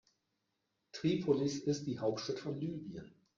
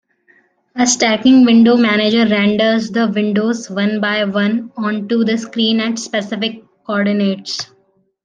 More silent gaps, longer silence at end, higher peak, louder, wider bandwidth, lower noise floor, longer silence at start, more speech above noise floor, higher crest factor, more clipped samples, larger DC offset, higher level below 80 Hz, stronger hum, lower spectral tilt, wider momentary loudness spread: neither; second, 0.3 s vs 0.6 s; second, -20 dBFS vs 0 dBFS; second, -37 LUFS vs -15 LUFS; second, 7.6 kHz vs 9.2 kHz; first, -84 dBFS vs -54 dBFS; first, 0.95 s vs 0.75 s; first, 48 dB vs 40 dB; about the same, 18 dB vs 14 dB; neither; neither; second, -72 dBFS vs -60 dBFS; neither; first, -6 dB/octave vs -4 dB/octave; first, 15 LU vs 12 LU